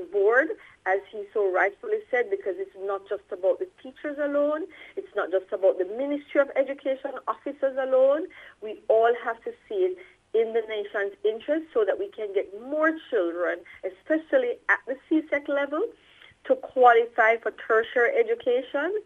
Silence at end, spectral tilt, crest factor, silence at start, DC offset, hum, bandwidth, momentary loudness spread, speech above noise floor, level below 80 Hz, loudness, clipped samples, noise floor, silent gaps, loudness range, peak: 0.05 s; -5 dB/octave; 20 dB; 0 s; under 0.1%; none; 6.8 kHz; 12 LU; 30 dB; -72 dBFS; -26 LUFS; under 0.1%; -55 dBFS; none; 5 LU; -6 dBFS